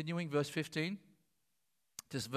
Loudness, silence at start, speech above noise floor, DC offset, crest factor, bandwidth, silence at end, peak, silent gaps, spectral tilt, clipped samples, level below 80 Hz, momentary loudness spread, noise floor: -39 LUFS; 0 s; 46 dB; under 0.1%; 18 dB; 15.5 kHz; 0 s; -22 dBFS; none; -5 dB/octave; under 0.1%; -78 dBFS; 16 LU; -84 dBFS